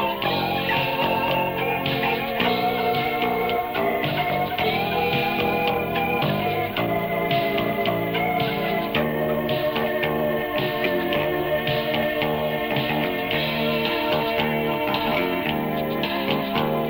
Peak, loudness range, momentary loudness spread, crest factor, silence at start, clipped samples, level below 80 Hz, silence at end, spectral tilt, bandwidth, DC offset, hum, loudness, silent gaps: -8 dBFS; 1 LU; 2 LU; 14 dB; 0 s; under 0.1%; -48 dBFS; 0 s; -7 dB/octave; 19 kHz; under 0.1%; none; -23 LUFS; none